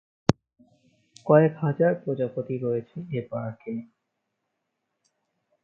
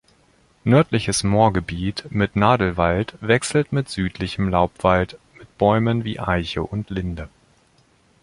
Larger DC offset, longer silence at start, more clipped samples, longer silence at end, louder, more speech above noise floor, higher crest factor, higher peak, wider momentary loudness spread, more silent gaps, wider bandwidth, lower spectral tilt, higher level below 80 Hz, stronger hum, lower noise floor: neither; second, 0.3 s vs 0.65 s; neither; first, 1.8 s vs 0.95 s; second, -26 LUFS vs -21 LUFS; first, 55 dB vs 38 dB; first, 28 dB vs 20 dB; about the same, 0 dBFS vs -2 dBFS; first, 16 LU vs 10 LU; neither; second, 7.8 kHz vs 11.5 kHz; first, -8 dB/octave vs -5.5 dB/octave; second, -58 dBFS vs -40 dBFS; neither; first, -80 dBFS vs -58 dBFS